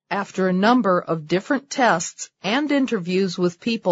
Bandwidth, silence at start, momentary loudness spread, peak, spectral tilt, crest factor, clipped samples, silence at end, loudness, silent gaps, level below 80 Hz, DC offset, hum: 8 kHz; 0.1 s; 7 LU; -4 dBFS; -5 dB/octave; 16 dB; under 0.1%; 0 s; -21 LUFS; none; -68 dBFS; under 0.1%; none